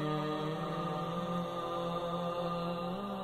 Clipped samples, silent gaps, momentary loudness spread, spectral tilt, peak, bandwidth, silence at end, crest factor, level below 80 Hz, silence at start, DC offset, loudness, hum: under 0.1%; none; 2 LU; -7 dB/octave; -24 dBFS; 15.5 kHz; 0 s; 12 dB; -62 dBFS; 0 s; under 0.1%; -36 LUFS; none